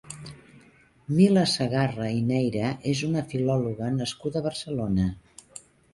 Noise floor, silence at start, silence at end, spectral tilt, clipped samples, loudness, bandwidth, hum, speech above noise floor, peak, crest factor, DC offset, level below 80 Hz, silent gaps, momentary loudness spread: -57 dBFS; 0.05 s; 0.35 s; -6 dB/octave; under 0.1%; -26 LUFS; 11.5 kHz; none; 32 dB; -8 dBFS; 18 dB; under 0.1%; -50 dBFS; none; 23 LU